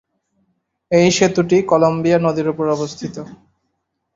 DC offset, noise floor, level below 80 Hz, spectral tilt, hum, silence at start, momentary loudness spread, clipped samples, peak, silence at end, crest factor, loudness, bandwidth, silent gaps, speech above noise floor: under 0.1%; -72 dBFS; -54 dBFS; -5.5 dB/octave; none; 0.9 s; 15 LU; under 0.1%; 0 dBFS; 0.85 s; 18 dB; -16 LUFS; 8 kHz; none; 57 dB